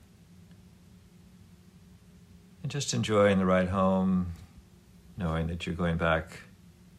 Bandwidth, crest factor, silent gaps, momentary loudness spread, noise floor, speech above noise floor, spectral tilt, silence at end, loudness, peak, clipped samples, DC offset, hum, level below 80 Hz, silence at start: 12 kHz; 20 dB; none; 19 LU; -55 dBFS; 28 dB; -6 dB/octave; 0.55 s; -28 LUFS; -12 dBFS; under 0.1%; under 0.1%; none; -50 dBFS; 0.5 s